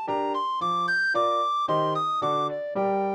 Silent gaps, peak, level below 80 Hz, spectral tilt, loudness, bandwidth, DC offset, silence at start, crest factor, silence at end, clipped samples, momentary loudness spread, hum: none; -14 dBFS; -74 dBFS; -5 dB/octave; -25 LUFS; 11.5 kHz; under 0.1%; 0 s; 12 dB; 0 s; under 0.1%; 4 LU; none